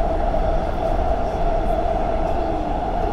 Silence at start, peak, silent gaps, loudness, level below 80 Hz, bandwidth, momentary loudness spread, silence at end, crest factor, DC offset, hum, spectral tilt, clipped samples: 0 s; -6 dBFS; none; -23 LUFS; -24 dBFS; 6.8 kHz; 2 LU; 0 s; 14 dB; 0.4%; none; -8 dB/octave; under 0.1%